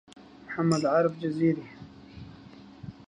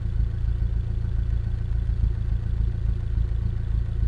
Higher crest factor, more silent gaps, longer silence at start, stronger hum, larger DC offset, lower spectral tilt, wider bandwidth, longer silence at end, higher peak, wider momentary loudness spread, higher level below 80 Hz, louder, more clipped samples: first, 18 dB vs 12 dB; neither; first, 0.2 s vs 0 s; neither; neither; second, -7 dB/octave vs -9 dB/octave; first, 10.5 kHz vs 4.6 kHz; about the same, 0.05 s vs 0 s; about the same, -12 dBFS vs -12 dBFS; first, 24 LU vs 2 LU; second, -62 dBFS vs -26 dBFS; about the same, -27 LUFS vs -27 LUFS; neither